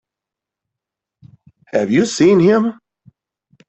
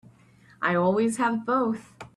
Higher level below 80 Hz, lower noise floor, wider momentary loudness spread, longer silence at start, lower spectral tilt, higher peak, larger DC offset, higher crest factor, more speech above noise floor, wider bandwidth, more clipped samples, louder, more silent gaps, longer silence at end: first, -58 dBFS vs -66 dBFS; first, -85 dBFS vs -56 dBFS; first, 11 LU vs 7 LU; first, 1.75 s vs 0.6 s; about the same, -6 dB/octave vs -6 dB/octave; first, -2 dBFS vs -12 dBFS; neither; about the same, 16 dB vs 16 dB; first, 72 dB vs 32 dB; second, 8.4 kHz vs 12.5 kHz; neither; first, -14 LUFS vs -25 LUFS; neither; first, 0.95 s vs 0.1 s